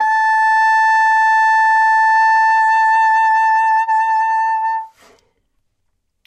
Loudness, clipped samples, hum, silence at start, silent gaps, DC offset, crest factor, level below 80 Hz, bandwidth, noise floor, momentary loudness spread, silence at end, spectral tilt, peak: -13 LUFS; under 0.1%; none; 0 s; none; under 0.1%; 8 dB; -76 dBFS; 8.4 kHz; -69 dBFS; 4 LU; 1.4 s; 3.5 dB/octave; -6 dBFS